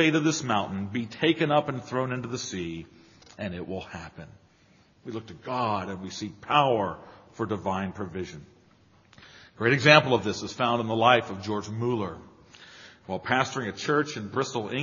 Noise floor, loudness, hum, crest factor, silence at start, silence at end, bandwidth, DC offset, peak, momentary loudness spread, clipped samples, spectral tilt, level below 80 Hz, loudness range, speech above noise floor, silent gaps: -60 dBFS; -26 LUFS; none; 28 dB; 0 s; 0 s; 7.2 kHz; under 0.1%; 0 dBFS; 18 LU; under 0.1%; -3.5 dB/octave; -62 dBFS; 12 LU; 33 dB; none